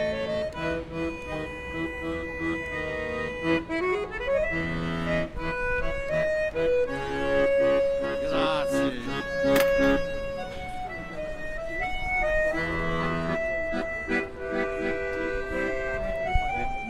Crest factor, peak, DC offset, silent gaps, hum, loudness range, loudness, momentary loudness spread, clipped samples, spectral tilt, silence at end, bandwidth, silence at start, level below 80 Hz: 18 dB; -8 dBFS; under 0.1%; none; none; 4 LU; -28 LUFS; 10 LU; under 0.1%; -5.5 dB/octave; 0 s; 16 kHz; 0 s; -38 dBFS